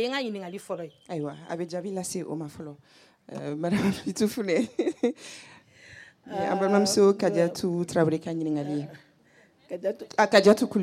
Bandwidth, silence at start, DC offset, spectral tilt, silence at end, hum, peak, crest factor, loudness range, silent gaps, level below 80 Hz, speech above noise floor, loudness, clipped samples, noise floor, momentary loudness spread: 16 kHz; 0 s; under 0.1%; -5 dB/octave; 0 s; none; -6 dBFS; 20 dB; 8 LU; none; -68 dBFS; 34 dB; -26 LUFS; under 0.1%; -60 dBFS; 18 LU